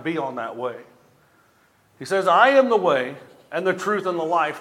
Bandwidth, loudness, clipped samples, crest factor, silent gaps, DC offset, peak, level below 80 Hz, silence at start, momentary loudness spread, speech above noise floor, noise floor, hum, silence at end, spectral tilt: 14 kHz; -21 LUFS; under 0.1%; 20 dB; none; under 0.1%; -2 dBFS; -78 dBFS; 0 s; 16 LU; 39 dB; -59 dBFS; none; 0 s; -5 dB/octave